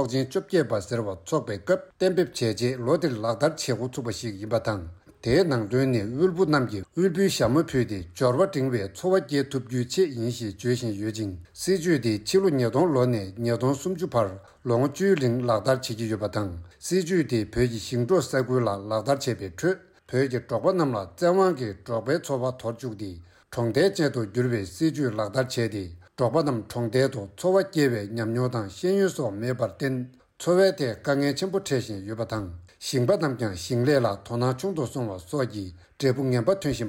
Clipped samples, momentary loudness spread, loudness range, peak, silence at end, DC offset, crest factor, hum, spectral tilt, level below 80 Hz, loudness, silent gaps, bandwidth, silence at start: under 0.1%; 9 LU; 2 LU; -10 dBFS; 0 s; under 0.1%; 16 dB; none; -6 dB/octave; -54 dBFS; -26 LUFS; none; 16 kHz; 0 s